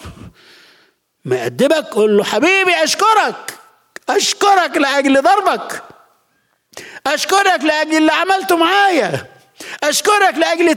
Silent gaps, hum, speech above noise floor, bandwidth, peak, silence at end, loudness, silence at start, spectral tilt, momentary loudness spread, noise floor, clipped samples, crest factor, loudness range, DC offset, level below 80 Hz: none; none; 49 dB; 17.5 kHz; -2 dBFS; 0 s; -13 LUFS; 0 s; -2.5 dB/octave; 16 LU; -62 dBFS; under 0.1%; 12 dB; 2 LU; under 0.1%; -58 dBFS